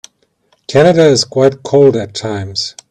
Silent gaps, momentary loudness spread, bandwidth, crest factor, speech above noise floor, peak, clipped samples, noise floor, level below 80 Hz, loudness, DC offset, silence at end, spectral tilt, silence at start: none; 12 LU; 11 kHz; 12 dB; 47 dB; 0 dBFS; under 0.1%; -58 dBFS; -52 dBFS; -12 LUFS; under 0.1%; 0.2 s; -5 dB/octave; 0.7 s